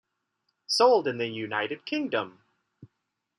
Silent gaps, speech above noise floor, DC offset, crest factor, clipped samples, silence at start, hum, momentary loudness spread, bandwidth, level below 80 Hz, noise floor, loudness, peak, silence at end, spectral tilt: none; 55 dB; under 0.1%; 20 dB; under 0.1%; 0.7 s; none; 11 LU; 13 kHz; -82 dBFS; -81 dBFS; -26 LUFS; -8 dBFS; 0.55 s; -3.5 dB/octave